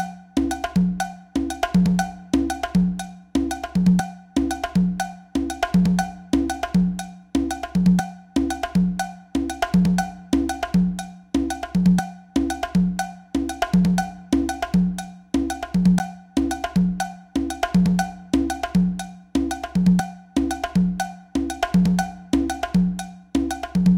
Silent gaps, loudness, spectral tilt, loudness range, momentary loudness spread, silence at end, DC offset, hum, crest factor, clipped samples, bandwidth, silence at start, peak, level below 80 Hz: none; -23 LUFS; -6.5 dB/octave; 1 LU; 8 LU; 0 s; under 0.1%; none; 16 dB; under 0.1%; 16 kHz; 0 s; -6 dBFS; -38 dBFS